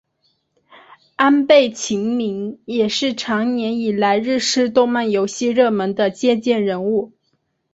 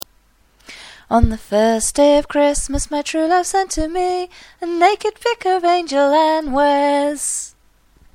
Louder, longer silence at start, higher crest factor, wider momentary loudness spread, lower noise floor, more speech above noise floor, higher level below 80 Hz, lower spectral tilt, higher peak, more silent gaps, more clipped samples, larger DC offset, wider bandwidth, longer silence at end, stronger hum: about the same, -18 LUFS vs -17 LUFS; first, 1.2 s vs 0.7 s; about the same, 16 dB vs 18 dB; second, 8 LU vs 11 LU; first, -68 dBFS vs -55 dBFS; first, 51 dB vs 39 dB; second, -62 dBFS vs -32 dBFS; about the same, -4 dB/octave vs -4 dB/octave; about the same, -2 dBFS vs 0 dBFS; neither; neither; neither; second, 8 kHz vs 16 kHz; about the same, 0.65 s vs 0.65 s; neither